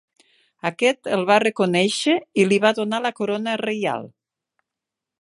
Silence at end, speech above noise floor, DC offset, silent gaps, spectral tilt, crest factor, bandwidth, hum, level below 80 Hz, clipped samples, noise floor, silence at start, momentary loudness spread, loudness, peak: 1.15 s; 65 dB; under 0.1%; none; -4.5 dB/octave; 18 dB; 11.5 kHz; none; -70 dBFS; under 0.1%; -86 dBFS; 0.65 s; 8 LU; -21 LUFS; -4 dBFS